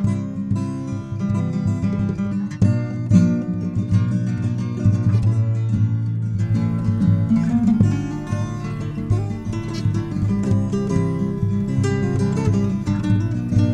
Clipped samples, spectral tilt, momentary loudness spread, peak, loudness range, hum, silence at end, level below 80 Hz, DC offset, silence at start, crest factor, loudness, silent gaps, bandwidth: under 0.1%; -8.5 dB/octave; 7 LU; -2 dBFS; 3 LU; none; 0 s; -40 dBFS; under 0.1%; 0 s; 16 dB; -21 LUFS; none; 9 kHz